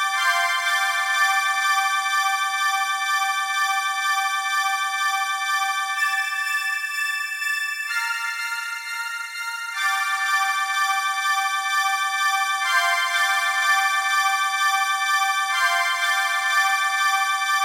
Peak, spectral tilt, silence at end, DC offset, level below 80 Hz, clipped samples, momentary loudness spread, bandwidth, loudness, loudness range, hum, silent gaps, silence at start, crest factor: -6 dBFS; 5.5 dB/octave; 0 s; under 0.1%; under -90 dBFS; under 0.1%; 5 LU; 16 kHz; -21 LUFS; 4 LU; none; none; 0 s; 16 dB